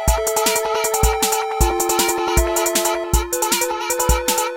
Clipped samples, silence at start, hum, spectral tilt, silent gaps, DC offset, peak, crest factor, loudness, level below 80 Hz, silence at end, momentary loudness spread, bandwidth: under 0.1%; 0 s; none; -3 dB/octave; none; under 0.1%; -2 dBFS; 16 dB; -18 LUFS; -26 dBFS; 0 s; 2 LU; 17 kHz